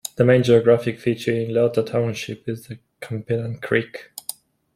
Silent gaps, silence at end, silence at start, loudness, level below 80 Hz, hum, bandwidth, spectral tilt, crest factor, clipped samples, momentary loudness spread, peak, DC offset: none; 0.45 s; 0.05 s; -20 LUFS; -58 dBFS; none; 15.5 kHz; -6 dB/octave; 18 dB; under 0.1%; 18 LU; -2 dBFS; under 0.1%